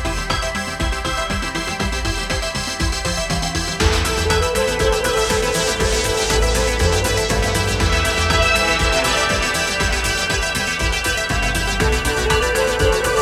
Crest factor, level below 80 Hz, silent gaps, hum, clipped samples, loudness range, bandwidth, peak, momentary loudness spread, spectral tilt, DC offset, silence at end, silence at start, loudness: 16 dB; -24 dBFS; none; none; under 0.1%; 4 LU; 16 kHz; -2 dBFS; 5 LU; -3 dB/octave; under 0.1%; 0 s; 0 s; -18 LUFS